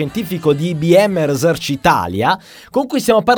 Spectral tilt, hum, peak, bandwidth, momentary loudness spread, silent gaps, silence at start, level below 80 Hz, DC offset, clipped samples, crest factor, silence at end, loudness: -5.5 dB/octave; none; 0 dBFS; over 20 kHz; 9 LU; none; 0 s; -46 dBFS; under 0.1%; under 0.1%; 14 dB; 0 s; -15 LUFS